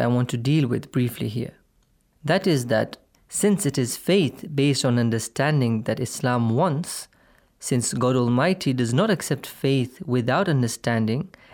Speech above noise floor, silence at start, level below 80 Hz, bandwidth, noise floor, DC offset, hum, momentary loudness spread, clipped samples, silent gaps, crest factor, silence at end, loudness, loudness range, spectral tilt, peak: 41 dB; 0 s; -60 dBFS; 20 kHz; -64 dBFS; under 0.1%; none; 8 LU; under 0.1%; none; 16 dB; 0.25 s; -23 LUFS; 2 LU; -5.5 dB/octave; -6 dBFS